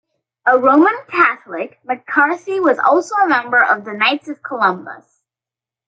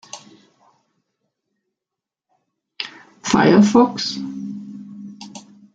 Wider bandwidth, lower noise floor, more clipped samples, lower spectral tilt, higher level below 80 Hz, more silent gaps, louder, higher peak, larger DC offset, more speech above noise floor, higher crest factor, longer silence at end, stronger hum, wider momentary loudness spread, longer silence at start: first, 8.8 kHz vs 7.8 kHz; about the same, -89 dBFS vs -86 dBFS; neither; about the same, -4.5 dB/octave vs -5.5 dB/octave; second, -70 dBFS vs -58 dBFS; neither; about the same, -15 LUFS vs -16 LUFS; about the same, 0 dBFS vs -2 dBFS; neither; about the same, 73 dB vs 71 dB; about the same, 16 dB vs 20 dB; first, 0.9 s vs 0.35 s; neither; second, 14 LU vs 25 LU; first, 0.45 s vs 0.15 s